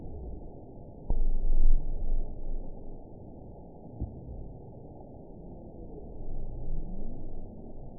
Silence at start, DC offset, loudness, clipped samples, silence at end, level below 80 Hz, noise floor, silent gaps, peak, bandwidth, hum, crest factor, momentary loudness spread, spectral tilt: 0 s; 0.2%; -40 LUFS; under 0.1%; 0 s; -30 dBFS; -47 dBFS; none; -10 dBFS; 1 kHz; none; 18 dB; 15 LU; -16 dB/octave